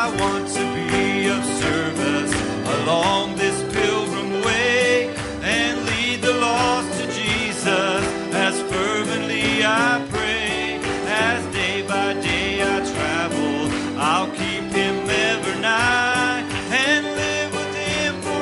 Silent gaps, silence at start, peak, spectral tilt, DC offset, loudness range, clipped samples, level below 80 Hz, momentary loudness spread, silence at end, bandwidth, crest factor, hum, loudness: none; 0 s; -6 dBFS; -3.5 dB/octave; under 0.1%; 2 LU; under 0.1%; -46 dBFS; 5 LU; 0 s; 11.5 kHz; 16 dB; none; -20 LUFS